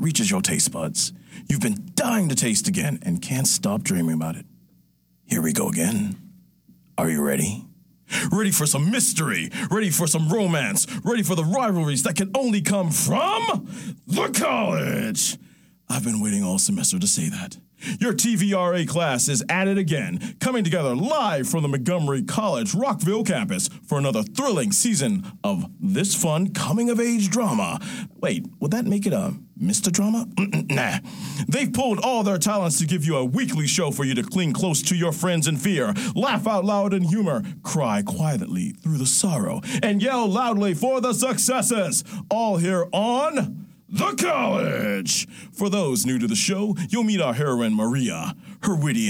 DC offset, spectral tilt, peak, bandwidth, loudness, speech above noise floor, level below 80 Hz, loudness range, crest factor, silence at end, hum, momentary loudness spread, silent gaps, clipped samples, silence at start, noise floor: under 0.1%; -4 dB/octave; -4 dBFS; 17 kHz; -22 LUFS; 38 dB; -62 dBFS; 2 LU; 18 dB; 0 s; none; 7 LU; none; under 0.1%; 0 s; -61 dBFS